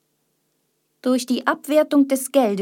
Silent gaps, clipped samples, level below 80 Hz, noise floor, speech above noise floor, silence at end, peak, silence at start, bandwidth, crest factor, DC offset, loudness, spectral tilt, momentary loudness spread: none; under 0.1%; -78 dBFS; -70 dBFS; 51 dB; 0 s; -4 dBFS; 1.05 s; 17.5 kHz; 18 dB; under 0.1%; -20 LUFS; -4 dB/octave; 5 LU